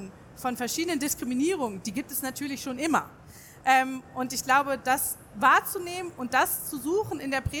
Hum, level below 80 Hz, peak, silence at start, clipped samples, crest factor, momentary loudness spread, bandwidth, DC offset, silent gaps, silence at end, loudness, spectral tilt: none; -54 dBFS; -8 dBFS; 0 s; under 0.1%; 20 dB; 10 LU; over 20 kHz; under 0.1%; none; 0 s; -27 LUFS; -3 dB/octave